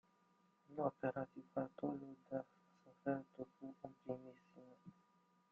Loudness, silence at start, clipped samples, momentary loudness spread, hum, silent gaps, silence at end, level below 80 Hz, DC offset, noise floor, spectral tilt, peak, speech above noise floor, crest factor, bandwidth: -48 LUFS; 0.7 s; under 0.1%; 19 LU; none; none; 0.6 s; -86 dBFS; under 0.1%; -77 dBFS; -8 dB/octave; -26 dBFS; 31 dB; 22 dB; 6.8 kHz